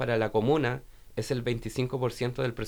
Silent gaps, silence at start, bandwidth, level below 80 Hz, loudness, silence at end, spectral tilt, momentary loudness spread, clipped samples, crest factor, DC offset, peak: none; 0 s; over 20 kHz; -50 dBFS; -30 LUFS; 0 s; -6.5 dB/octave; 10 LU; under 0.1%; 16 dB; under 0.1%; -14 dBFS